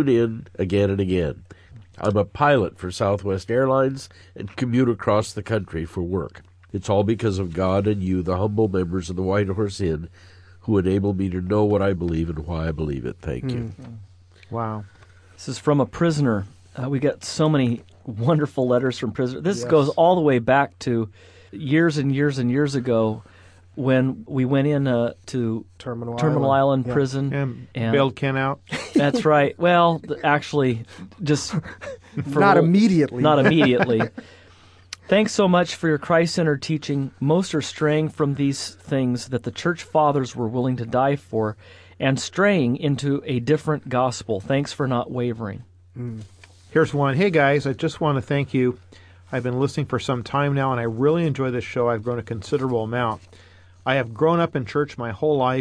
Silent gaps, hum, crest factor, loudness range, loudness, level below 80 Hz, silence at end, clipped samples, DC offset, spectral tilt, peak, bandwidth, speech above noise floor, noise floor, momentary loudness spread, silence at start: none; none; 18 dB; 4 LU; -22 LUFS; -48 dBFS; 0 s; under 0.1%; under 0.1%; -6.5 dB/octave; -4 dBFS; 11 kHz; 29 dB; -50 dBFS; 12 LU; 0 s